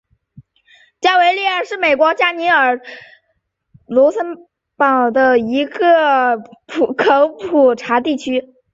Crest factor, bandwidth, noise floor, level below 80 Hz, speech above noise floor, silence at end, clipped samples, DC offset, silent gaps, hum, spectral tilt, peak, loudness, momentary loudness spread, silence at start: 14 dB; 7.8 kHz; -68 dBFS; -60 dBFS; 53 dB; 0.3 s; under 0.1%; under 0.1%; none; none; -4 dB/octave; -2 dBFS; -14 LUFS; 10 LU; 1 s